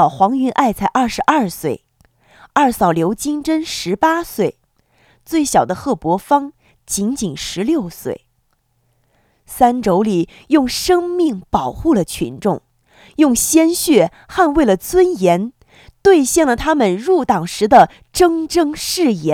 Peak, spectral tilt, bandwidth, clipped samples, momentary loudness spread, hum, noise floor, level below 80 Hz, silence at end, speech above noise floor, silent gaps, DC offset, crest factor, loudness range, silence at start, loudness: 0 dBFS; -4.5 dB/octave; 18 kHz; under 0.1%; 9 LU; none; -63 dBFS; -42 dBFS; 0 s; 48 dB; none; under 0.1%; 16 dB; 6 LU; 0 s; -16 LUFS